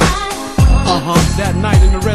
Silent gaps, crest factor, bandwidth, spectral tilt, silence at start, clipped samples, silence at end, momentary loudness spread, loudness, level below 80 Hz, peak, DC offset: none; 10 dB; 13 kHz; -5.5 dB/octave; 0 s; under 0.1%; 0 s; 5 LU; -13 LUFS; -16 dBFS; 0 dBFS; under 0.1%